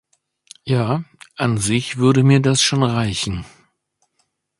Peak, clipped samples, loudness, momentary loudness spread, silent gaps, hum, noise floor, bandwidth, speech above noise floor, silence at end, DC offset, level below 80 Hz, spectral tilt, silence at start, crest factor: 0 dBFS; under 0.1%; -18 LUFS; 12 LU; none; none; -69 dBFS; 11.5 kHz; 52 dB; 1.1 s; under 0.1%; -46 dBFS; -5 dB/octave; 0.65 s; 18 dB